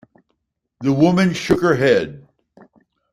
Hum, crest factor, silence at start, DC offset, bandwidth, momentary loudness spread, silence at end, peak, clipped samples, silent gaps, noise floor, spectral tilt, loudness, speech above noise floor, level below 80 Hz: none; 18 dB; 0.8 s; under 0.1%; 14 kHz; 8 LU; 0.95 s; -2 dBFS; under 0.1%; none; -72 dBFS; -6.5 dB/octave; -17 LUFS; 56 dB; -50 dBFS